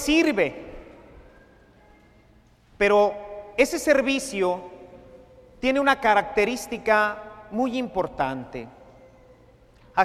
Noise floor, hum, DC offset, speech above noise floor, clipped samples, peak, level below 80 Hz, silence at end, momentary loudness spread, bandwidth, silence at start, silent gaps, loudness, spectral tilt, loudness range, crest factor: -56 dBFS; none; under 0.1%; 34 dB; under 0.1%; -4 dBFS; -52 dBFS; 0 s; 18 LU; 15.5 kHz; 0 s; none; -23 LUFS; -4 dB/octave; 4 LU; 22 dB